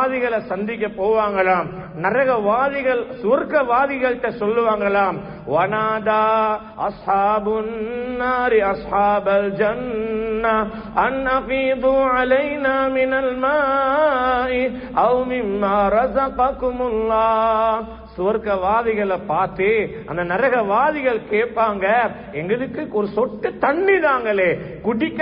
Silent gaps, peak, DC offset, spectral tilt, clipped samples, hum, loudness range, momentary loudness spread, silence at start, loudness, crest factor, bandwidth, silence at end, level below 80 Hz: none; -4 dBFS; under 0.1%; -10.5 dB/octave; under 0.1%; none; 2 LU; 7 LU; 0 s; -19 LUFS; 14 dB; 5.4 kHz; 0 s; -44 dBFS